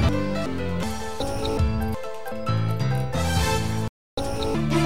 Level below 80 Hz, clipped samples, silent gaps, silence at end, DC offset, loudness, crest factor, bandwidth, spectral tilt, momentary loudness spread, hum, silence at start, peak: -34 dBFS; under 0.1%; 3.89-4.17 s; 0 s; 2%; -26 LUFS; 16 dB; 16 kHz; -6 dB/octave; 7 LU; none; 0 s; -8 dBFS